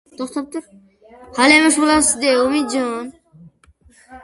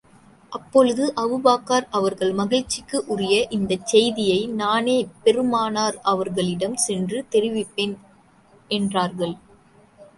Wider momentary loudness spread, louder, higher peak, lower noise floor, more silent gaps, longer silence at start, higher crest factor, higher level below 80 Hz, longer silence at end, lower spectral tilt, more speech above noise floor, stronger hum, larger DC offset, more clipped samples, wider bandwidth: first, 19 LU vs 8 LU; first, -15 LUFS vs -21 LUFS; first, 0 dBFS vs -4 dBFS; about the same, -52 dBFS vs -54 dBFS; neither; second, 0.2 s vs 0.5 s; about the same, 18 dB vs 18 dB; first, -50 dBFS vs -58 dBFS; about the same, 0.05 s vs 0.15 s; second, -1.5 dB/octave vs -4 dB/octave; about the same, 36 dB vs 33 dB; neither; neither; neither; about the same, 11.5 kHz vs 11.5 kHz